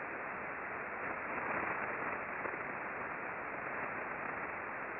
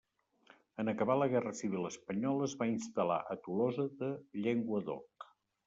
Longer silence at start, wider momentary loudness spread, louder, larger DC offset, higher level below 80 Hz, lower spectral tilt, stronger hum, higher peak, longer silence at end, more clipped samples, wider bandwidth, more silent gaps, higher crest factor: second, 0 s vs 0.8 s; second, 4 LU vs 12 LU; second, -40 LUFS vs -36 LUFS; neither; first, -70 dBFS vs -78 dBFS; second, -4.5 dB/octave vs -6.5 dB/octave; neither; second, -24 dBFS vs -18 dBFS; second, 0 s vs 0.4 s; neither; second, 5.4 kHz vs 8 kHz; neither; about the same, 16 dB vs 18 dB